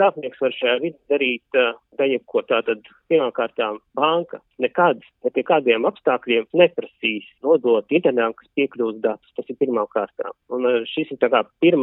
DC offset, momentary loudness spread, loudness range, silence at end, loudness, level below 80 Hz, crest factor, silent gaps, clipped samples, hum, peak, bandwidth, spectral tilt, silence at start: under 0.1%; 8 LU; 3 LU; 0 s; -21 LUFS; -74 dBFS; 18 dB; none; under 0.1%; none; -2 dBFS; 4 kHz; -9 dB/octave; 0 s